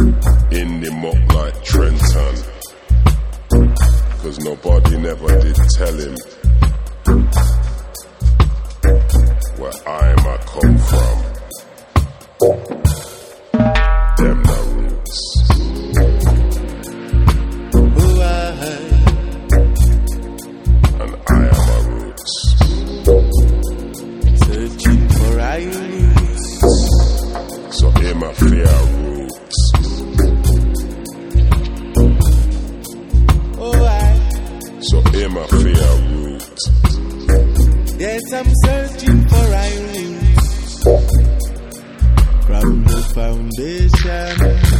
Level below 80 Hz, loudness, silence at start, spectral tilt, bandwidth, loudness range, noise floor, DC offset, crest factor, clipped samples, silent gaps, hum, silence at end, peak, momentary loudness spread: -14 dBFS; -15 LUFS; 0 s; -6 dB/octave; 15.5 kHz; 2 LU; -35 dBFS; under 0.1%; 12 dB; under 0.1%; none; none; 0 s; 0 dBFS; 11 LU